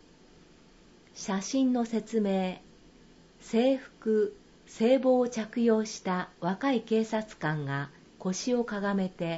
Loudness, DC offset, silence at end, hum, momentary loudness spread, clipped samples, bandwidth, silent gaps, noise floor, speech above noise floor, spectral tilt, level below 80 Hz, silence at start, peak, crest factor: -29 LUFS; under 0.1%; 0 s; none; 9 LU; under 0.1%; 8 kHz; none; -57 dBFS; 29 dB; -5.5 dB/octave; -66 dBFS; 1.15 s; -12 dBFS; 18 dB